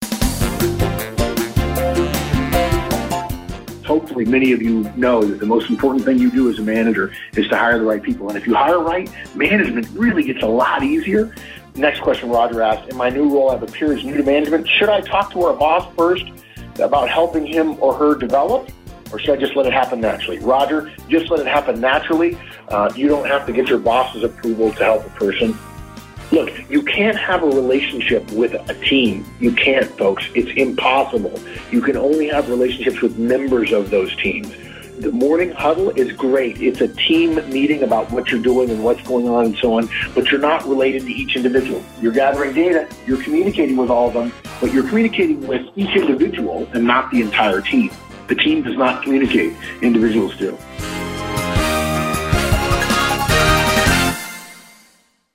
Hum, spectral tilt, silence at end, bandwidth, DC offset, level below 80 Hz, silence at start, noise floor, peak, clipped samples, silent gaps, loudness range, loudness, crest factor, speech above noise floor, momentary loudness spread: none; -5 dB/octave; 0.75 s; 16 kHz; under 0.1%; -34 dBFS; 0 s; -56 dBFS; 0 dBFS; under 0.1%; none; 2 LU; -17 LUFS; 16 dB; 39 dB; 8 LU